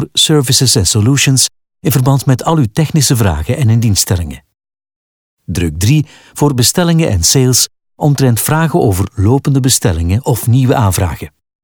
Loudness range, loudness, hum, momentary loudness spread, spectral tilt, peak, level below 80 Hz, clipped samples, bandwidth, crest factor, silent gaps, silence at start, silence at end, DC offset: 4 LU; -11 LUFS; none; 8 LU; -4.5 dB/octave; 0 dBFS; -32 dBFS; under 0.1%; over 20 kHz; 12 dB; 4.96-5.37 s; 0 s; 0.35 s; under 0.1%